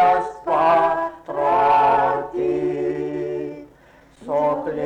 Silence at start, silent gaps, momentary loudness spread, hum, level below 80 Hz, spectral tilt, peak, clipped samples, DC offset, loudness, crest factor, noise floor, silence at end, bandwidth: 0 s; none; 12 LU; none; -54 dBFS; -7 dB/octave; -8 dBFS; under 0.1%; under 0.1%; -20 LUFS; 12 dB; -50 dBFS; 0 s; 9.4 kHz